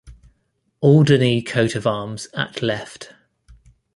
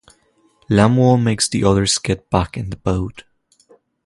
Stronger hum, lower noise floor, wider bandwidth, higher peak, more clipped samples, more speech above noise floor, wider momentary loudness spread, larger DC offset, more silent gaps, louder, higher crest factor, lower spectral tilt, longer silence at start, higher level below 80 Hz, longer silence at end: neither; first, -68 dBFS vs -58 dBFS; about the same, 11.5 kHz vs 11.5 kHz; about the same, -2 dBFS vs 0 dBFS; neither; first, 50 dB vs 42 dB; first, 19 LU vs 11 LU; neither; neither; about the same, -19 LUFS vs -17 LUFS; about the same, 18 dB vs 18 dB; first, -6.5 dB/octave vs -5 dB/octave; second, 0.05 s vs 0.7 s; second, -52 dBFS vs -36 dBFS; about the same, 0.9 s vs 0.85 s